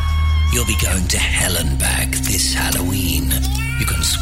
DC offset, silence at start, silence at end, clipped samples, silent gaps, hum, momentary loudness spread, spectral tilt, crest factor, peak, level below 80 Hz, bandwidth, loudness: under 0.1%; 0 s; 0 s; under 0.1%; none; none; 3 LU; -3 dB/octave; 14 dB; -2 dBFS; -20 dBFS; 16.5 kHz; -17 LUFS